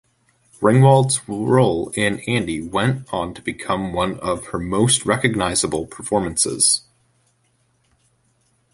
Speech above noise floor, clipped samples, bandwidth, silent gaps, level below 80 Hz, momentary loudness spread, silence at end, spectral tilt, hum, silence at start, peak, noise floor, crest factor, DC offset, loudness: 45 dB; under 0.1%; 11.5 kHz; none; -46 dBFS; 11 LU; 1.95 s; -4.5 dB/octave; none; 0.6 s; -2 dBFS; -64 dBFS; 18 dB; under 0.1%; -19 LUFS